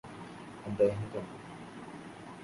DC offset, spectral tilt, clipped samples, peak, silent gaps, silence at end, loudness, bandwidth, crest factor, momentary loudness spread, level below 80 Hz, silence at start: under 0.1%; -7 dB/octave; under 0.1%; -16 dBFS; none; 0 s; -34 LUFS; 11.5 kHz; 22 dB; 17 LU; -64 dBFS; 0.05 s